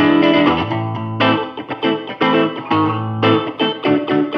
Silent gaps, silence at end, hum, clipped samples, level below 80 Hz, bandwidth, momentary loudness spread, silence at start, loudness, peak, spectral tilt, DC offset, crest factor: none; 0 s; none; under 0.1%; -52 dBFS; 6 kHz; 8 LU; 0 s; -17 LUFS; -2 dBFS; -8 dB/octave; under 0.1%; 14 dB